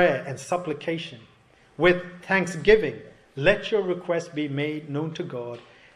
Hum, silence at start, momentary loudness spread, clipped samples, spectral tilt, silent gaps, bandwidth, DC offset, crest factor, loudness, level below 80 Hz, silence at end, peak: none; 0 s; 15 LU; under 0.1%; -5.5 dB/octave; none; 11.5 kHz; under 0.1%; 22 dB; -25 LUFS; -52 dBFS; 0.35 s; -4 dBFS